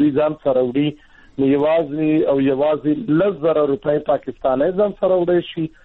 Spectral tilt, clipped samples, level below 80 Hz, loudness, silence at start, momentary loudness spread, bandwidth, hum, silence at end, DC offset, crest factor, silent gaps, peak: -10 dB/octave; under 0.1%; -50 dBFS; -18 LUFS; 0 s; 5 LU; 4.1 kHz; none; 0.15 s; under 0.1%; 10 dB; none; -8 dBFS